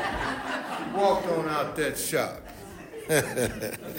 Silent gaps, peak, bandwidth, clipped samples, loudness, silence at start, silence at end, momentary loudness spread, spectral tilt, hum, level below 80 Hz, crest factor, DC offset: none; -10 dBFS; 16.5 kHz; under 0.1%; -28 LUFS; 0 s; 0 s; 17 LU; -4 dB/octave; none; -50 dBFS; 18 dB; under 0.1%